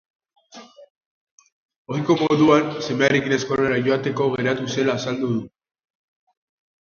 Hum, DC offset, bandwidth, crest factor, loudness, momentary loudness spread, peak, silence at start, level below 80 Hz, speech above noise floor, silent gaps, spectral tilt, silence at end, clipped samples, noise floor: none; under 0.1%; 7.2 kHz; 22 dB; -20 LUFS; 9 LU; -2 dBFS; 0.55 s; -60 dBFS; 25 dB; 0.90-1.38 s, 1.52-1.69 s, 1.76-1.85 s; -5.5 dB/octave; 1.35 s; under 0.1%; -45 dBFS